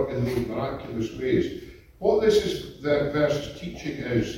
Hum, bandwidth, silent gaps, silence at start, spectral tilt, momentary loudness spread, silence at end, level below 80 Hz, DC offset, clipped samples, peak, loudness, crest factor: none; 16.5 kHz; none; 0 s; -6 dB/octave; 11 LU; 0 s; -46 dBFS; under 0.1%; under 0.1%; -8 dBFS; -26 LUFS; 18 dB